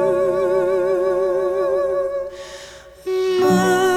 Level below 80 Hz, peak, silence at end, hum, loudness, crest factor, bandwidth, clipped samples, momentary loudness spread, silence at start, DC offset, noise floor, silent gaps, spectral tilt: -52 dBFS; -4 dBFS; 0 s; none; -19 LUFS; 14 dB; 15.5 kHz; under 0.1%; 18 LU; 0 s; under 0.1%; -39 dBFS; none; -5.5 dB/octave